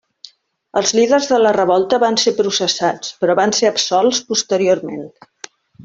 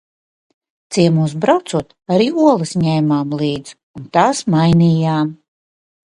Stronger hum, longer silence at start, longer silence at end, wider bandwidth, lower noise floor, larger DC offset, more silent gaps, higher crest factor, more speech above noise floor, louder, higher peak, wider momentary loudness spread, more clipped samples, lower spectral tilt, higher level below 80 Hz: neither; second, 0.75 s vs 0.9 s; second, 0 s vs 0.75 s; second, 7.8 kHz vs 11.5 kHz; second, -44 dBFS vs under -90 dBFS; neither; second, none vs 3.83-3.94 s; about the same, 14 dB vs 16 dB; second, 29 dB vs over 75 dB; about the same, -15 LUFS vs -15 LUFS; about the same, -2 dBFS vs 0 dBFS; second, 7 LU vs 10 LU; neither; second, -2.5 dB/octave vs -6.5 dB/octave; second, -60 dBFS vs -50 dBFS